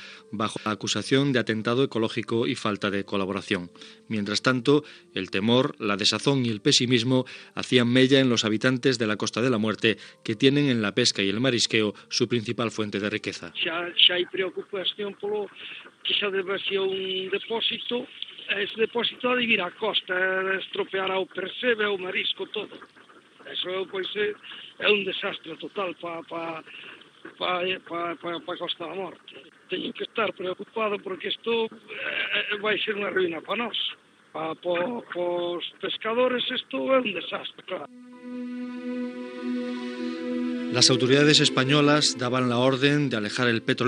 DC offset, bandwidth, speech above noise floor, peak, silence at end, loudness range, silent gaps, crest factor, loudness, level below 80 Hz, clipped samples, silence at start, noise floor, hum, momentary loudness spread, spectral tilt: under 0.1%; 10.5 kHz; 24 dB; -4 dBFS; 0 s; 9 LU; none; 22 dB; -25 LUFS; -80 dBFS; under 0.1%; 0 s; -50 dBFS; none; 14 LU; -4 dB/octave